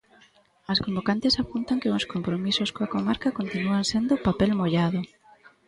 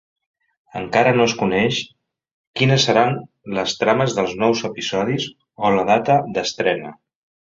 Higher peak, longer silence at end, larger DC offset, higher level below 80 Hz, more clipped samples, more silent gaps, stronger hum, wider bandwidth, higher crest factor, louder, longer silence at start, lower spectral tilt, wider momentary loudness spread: second, -10 dBFS vs -2 dBFS; second, 0.2 s vs 0.65 s; neither; first, -50 dBFS vs -56 dBFS; neither; second, none vs 2.31-2.54 s; neither; first, 11.5 kHz vs 7.8 kHz; about the same, 16 dB vs 18 dB; second, -25 LUFS vs -19 LUFS; about the same, 0.7 s vs 0.75 s; about the same, -5.5 dB/octave vs -5 dB/octave; second, 5 LU vs 13 LU